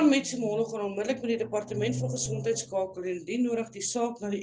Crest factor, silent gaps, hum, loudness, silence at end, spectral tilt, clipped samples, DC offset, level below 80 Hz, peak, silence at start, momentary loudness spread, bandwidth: 18 dB; none; none; -30 LUFS; 0 s; -4.5 dB/octave; under 0.1%; under 0.1%; -66 dBFS; -12 dBFS; 0 s; 3 LU; 10 kHz